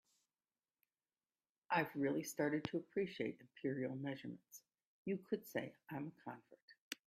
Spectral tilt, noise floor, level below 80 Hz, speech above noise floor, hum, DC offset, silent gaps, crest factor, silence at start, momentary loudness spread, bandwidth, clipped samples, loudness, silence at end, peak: -5.5 dB/octave; under -90 dBFS; -84 dBFS; over 47 dB; none; under 0.1%; 4.85-5.05 s, 6.62-6.68 s, 6.80-6.91 s; 24 dB; 1.7 s; 15 LU; 15.5 kHz; under 0.1%; -44 LUFS; 0.15 s; -22 dBFS